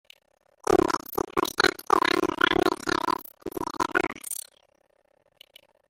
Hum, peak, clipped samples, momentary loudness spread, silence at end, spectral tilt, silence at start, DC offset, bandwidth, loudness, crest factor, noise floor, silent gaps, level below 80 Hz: none; -6 dBFS; under 0.1%; 12 LU; 1.55 s; -3 dB/octave; 0.7 s; under 0.1%; 17 kHz; -26 LUFS; 22 dB; -67 dBFS; none; -56 dBFS